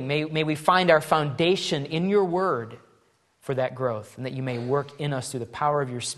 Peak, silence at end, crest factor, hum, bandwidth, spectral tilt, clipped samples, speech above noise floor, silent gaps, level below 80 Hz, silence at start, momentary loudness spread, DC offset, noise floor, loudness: -4 dBFS; 0.05 s; 22 dB; none; 12.5 kHz; -5 dB/octave; under 0.1%; 39 dB; none; -66 dBFS; 0 s; 11 LU; under 0.1%; -64 dBFS; -25 LUFS